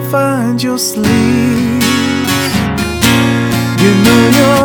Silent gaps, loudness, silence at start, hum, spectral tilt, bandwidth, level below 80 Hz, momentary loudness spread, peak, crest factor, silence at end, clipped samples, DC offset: none; -11 LUFS; 0 s; none; -5 dB/octave; 19.5 kHz; -34 dBFS; 6 LU; 0 dBFS; 10 dB; 0 s; 0.4%; under 0.1%